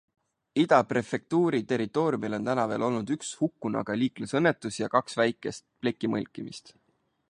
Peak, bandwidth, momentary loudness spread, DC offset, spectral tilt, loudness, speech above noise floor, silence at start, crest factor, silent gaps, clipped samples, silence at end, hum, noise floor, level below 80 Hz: -6 dBFS; 11 kHz; 9 LU; under 0.1%; -5.5 dB/octave; -28 LUFS; 45 dB; 0.55 s; 22 dB; none; under 0.1%; 0.6 s; none; -73 dBFS; -68 dBFS